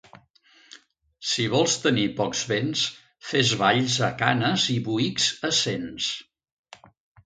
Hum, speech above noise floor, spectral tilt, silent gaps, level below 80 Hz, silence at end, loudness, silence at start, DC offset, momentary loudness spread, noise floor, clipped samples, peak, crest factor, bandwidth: none; 34 dB; -3.5 dB/octave; none; -62 dBFS; 1.05 s; -23 LUFS; 0.75 s; under 0.1%; 7 LU; -58 dBFS; under 0.1%; -2 dBFS; 24 dB; 9.6 kHz